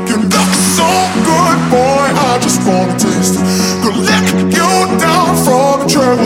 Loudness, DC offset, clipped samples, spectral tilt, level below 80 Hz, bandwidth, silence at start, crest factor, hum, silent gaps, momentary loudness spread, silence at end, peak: -10 LUFS; under 0.1%; under 0.1%; -4 dB/octave; -42 dBFS; 17 kHz; 0 s; 10 dB; none; none; 2 LU; 0 s; 0 dBFS